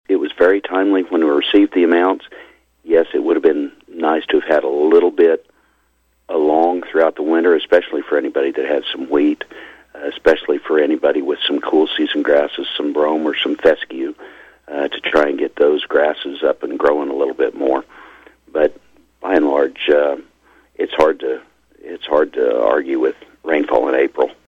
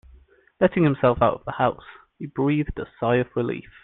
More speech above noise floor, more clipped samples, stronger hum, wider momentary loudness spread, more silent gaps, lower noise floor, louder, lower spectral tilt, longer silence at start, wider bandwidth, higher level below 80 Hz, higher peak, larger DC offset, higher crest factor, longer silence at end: first, 45 dB vs 31 dB; neither; neither; about the same, 10 LU vs 11 LU; neither; first, -61 dBFS vs -54 dBFS; first, -16 LUFS vs -23 LUFS; second, -5 dB/octave vs -11 dB/octave; second, 0.1 s vs 0.6 s; first, 7.2 kHz vs 4.2 kHz; second, -54 dBFS vs -46 dBFS; about the same, -2 dBFS vs -4 dBFS; neither; about the same, 16 dB vs 18 dB; about the same, 0.2 s vs 0.2 s